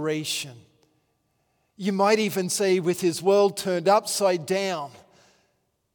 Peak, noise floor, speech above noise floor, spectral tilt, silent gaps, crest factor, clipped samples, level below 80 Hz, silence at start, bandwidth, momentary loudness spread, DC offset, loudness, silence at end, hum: -8 dBFS; -72 dBFS; 48 dB; -4 dB/octave; none; 18 dB; under 0.1%; -76 dBFS; 0 s; over 20 kHz; 10 LU; under 0.1%; -23 LUFS; 1.05 s; none